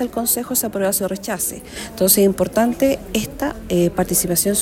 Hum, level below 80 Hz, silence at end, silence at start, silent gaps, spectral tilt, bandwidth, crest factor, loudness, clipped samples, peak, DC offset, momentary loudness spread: none; -42 dBFS; 0 s; 0 s; none; -4 dB/octave; 16.5 kHz; 18 dB; -18 LUFS; under 0.1%; -2 dBFS; under 0.1%; 10 LU